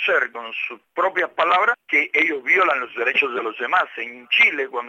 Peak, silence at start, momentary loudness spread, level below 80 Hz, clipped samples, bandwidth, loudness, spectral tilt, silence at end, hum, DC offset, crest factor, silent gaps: -4 dBFS; 0 s; 11 LU; -82 dBFS; under 0.1%; 15.5 kHz; -19 LUFS; -2.5 dB/octave; 0 s; none; under 0.1%; 16 dB; none